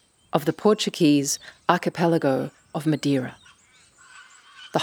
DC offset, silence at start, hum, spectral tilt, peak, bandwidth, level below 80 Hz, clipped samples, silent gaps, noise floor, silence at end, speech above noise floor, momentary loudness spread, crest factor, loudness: under 0.1%; 0.35 s; none; -5 dB/octave; -2 dBFS; over 20 kHz; -72 dBFS; under 0.1%; none; -56 dBFS; 0 s; 34 dB; 9 LU; 24 dB; -23 LUFS